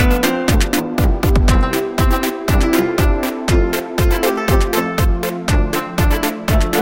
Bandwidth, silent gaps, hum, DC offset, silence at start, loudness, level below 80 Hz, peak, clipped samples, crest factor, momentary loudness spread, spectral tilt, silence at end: 17 kHz; none; none; under 0.1%; 0 s; -17 LUFS; -18 dBFS; 0 dBFS; under 0.1%; 14 dB; 3 LU; -5.5 dB/octave; 0 s